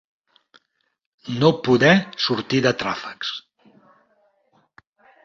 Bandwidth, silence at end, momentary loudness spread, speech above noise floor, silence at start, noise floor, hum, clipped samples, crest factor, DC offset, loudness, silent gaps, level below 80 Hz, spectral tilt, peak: 7.4 kHz; 1.85 s; 15 LU; 50 dB; 1.25 s; -69 dBFS; none; under 0.1%; 22 dB; under 0.1%; -20 LUFS; none; -60 dBFS; -5.5 dB/octave; -2 dBFS